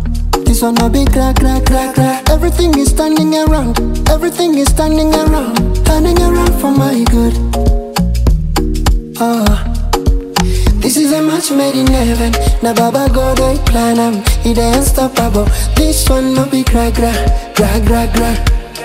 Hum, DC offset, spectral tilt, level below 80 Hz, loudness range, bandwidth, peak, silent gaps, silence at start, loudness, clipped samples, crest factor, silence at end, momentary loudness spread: none; under 0.1%; -5.5 dB/octave; -14 dBFS; 2 LU; 16 kHz; 0 dBFS; none; 0 s; -12 LUFS; under 0.1%; 10 dB; 0 s; 4 LU